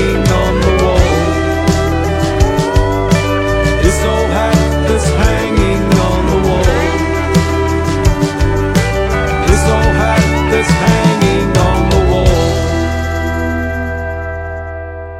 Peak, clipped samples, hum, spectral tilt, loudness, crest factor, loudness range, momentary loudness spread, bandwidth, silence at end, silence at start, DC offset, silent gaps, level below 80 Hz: 0 dBFS; under 0.1%; none; -6 dB/octave; -13 LUFS; 12 dB; 2 LU; 6 LU; 15.5 kHz; 0 s; 0 s; under 0.1%; none; -18 dBFS